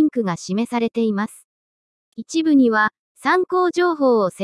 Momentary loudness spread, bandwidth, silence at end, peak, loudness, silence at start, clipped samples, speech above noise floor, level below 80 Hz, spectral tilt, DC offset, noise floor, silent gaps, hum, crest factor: 10 LU; 12 kHz; 0 s; -4 dBFS; -19 LUFS; 0 s; under 0.1%; over 72 dB; -70 dBFS; -5.5 dB/octave; under 0.1%; under -90 dBFS; 1.44-2.12 s, 2.99-3.15 s; none; 14 dB